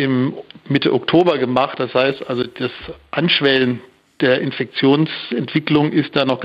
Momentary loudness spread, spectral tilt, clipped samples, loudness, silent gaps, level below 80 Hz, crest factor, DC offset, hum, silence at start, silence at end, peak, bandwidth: 9 LU; -8 dB/octave; under 0.1%; -17 LUFS; none; -56 dBFS; 16 dB; under 0.1%; none; 0 s; 0 s; -2 dBFS; 7 kHz